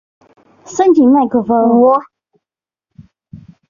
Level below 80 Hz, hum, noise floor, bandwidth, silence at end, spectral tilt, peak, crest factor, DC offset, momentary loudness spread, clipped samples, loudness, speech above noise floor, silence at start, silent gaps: -56 dBFS; none; -87 dBFS; 7.4 kHz; 0.35 s; -6.5 dB/octave; -2 dBFS; 12 dB; under 0.1%; 7 LU; under 0.1%; -11 LUFS; 77 dB; 0.7 s; none